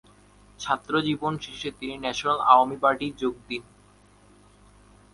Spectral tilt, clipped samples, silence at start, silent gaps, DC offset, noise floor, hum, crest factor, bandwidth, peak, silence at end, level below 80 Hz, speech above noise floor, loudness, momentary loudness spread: -4.5 dB/octave; under 0.1%; 0.6 s; none; under 0.1%; -56 dBFS; 50 Hz at -55 dBFS; 24 dB; 11.5 kHz; -2 dBFS; 1.55 s; -58 dBFS; 31 dB; -25 LUFS; 16 LU